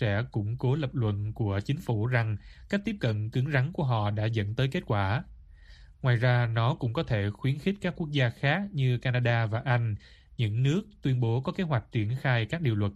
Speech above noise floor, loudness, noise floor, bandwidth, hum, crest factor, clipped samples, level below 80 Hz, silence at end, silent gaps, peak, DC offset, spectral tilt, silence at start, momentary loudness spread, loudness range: 23 dB; -29 LUFS; -51 dBFS; 8 kHz; none; 16 dB; under 0.1%; -52 dBFS; 0 s; none; -12 dBFS; under 0.1%; -8 dB/octave; 0 s; 5 LU; 2 LU